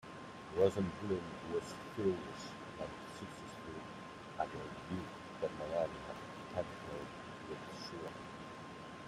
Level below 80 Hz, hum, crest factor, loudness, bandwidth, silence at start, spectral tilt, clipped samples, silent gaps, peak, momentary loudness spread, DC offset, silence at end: -68 dBFS; none; 24 dB; -43 LUFS; 14 kHz; 0 s; -6 dB/octave; under 0.1%; none; -18 dBFS; 11 LU; under 0.1%; 0 s